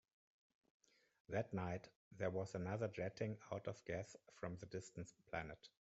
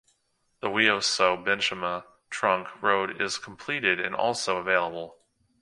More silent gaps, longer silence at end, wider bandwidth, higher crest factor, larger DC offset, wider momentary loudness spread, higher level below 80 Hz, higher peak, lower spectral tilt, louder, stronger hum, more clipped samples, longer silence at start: first, 1.96-2.11 s vs none; second, 0.15 s vs 0.5 s; second, 8 kHz vs 11.5 kHz; about the same, 22 dB vs 22 dB; neither; second, 9 LU vs 12 LU; second, -74 dBFS vs -66 dBFS; second, -28 dBFS vs -6 dBFS; first, -6.5 dB/octave vs -2 dB/octave; second, -48 LUFS vs -26 LUFS; neither; neither; first, 1.3 s vs 0.65 s